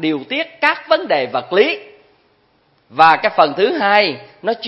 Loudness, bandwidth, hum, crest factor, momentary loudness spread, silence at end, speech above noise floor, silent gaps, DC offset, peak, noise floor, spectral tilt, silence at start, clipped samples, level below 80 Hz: -15 LUFS; 8 kHz; none; 16 dB; 11 LU; 0 s; 42 dB; none; under 0.1%; 0 dBFS; -58 dBFS; -6 dB/octave; 0 s; under 0.1%; -64 dBFS